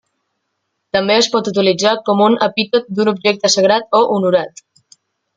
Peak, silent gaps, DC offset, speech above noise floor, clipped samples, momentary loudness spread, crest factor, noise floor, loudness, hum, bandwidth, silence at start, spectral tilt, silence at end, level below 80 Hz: 0 dBFS; none; under 0.1%; 58 dB; under 0.1%; 5 LU; 16 dB; -72 dBFS; -14 LUFS; none; 9.6 kHz; 0.95 s; -3.5 dB/octave; 0.9 s; -60 dBFS